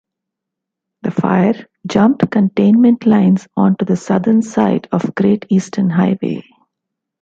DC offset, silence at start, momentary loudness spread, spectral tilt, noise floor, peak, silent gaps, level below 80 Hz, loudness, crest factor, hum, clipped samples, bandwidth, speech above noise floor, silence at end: under 0.1%; 1.05 s; 9 LU; -8 dB/octave; -81 dBFS; -2 dBFS; none; -56 dBFS; -14 LUFS; 12 dB; none; under 0.1%; 7.8 kHz; 67 dB; 0.8 s